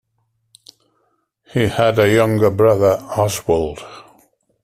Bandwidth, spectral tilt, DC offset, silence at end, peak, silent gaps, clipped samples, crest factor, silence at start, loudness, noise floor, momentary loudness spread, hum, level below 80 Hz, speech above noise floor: 16 kHz; -6 dB/octave; under 0.1%; 0.6 s; -2 dBFS; none; under 0.1%; 16 dB; 1.55 s; -16 LUFS; -67 dBFS; 12 LU; none; -48 dBFS; 52 dB